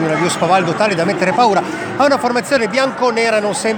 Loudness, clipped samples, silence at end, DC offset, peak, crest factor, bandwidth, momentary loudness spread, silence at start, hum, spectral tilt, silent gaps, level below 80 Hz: -15 LUFS; under 0.1%; 0 s; under 0.1%; 0 dBFS; 14 dB; over 20 kHz; 3 LU; 0 s; none; -4.5 dB/octave; none; -58 dBFS